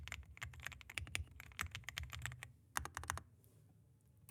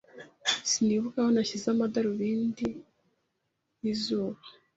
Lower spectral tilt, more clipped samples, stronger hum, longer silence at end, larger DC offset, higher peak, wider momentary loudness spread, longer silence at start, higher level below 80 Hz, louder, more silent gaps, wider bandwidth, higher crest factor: second, -2 dB/octave vs -4 dB/octave; neither; neither; second, 0 s vs 0.25 s; neither; second, -18 dBFS vs -12 dBFS; first, 21 LU vs 10 LU; second, 0 s vs 0.15 s; first, -60 dBFS vs -66 dBFS; second, -48 LUFS vs -29 LUFS; neither; first, over 20 kHz vs 8 kHz; first, 32 dB vs 18 dB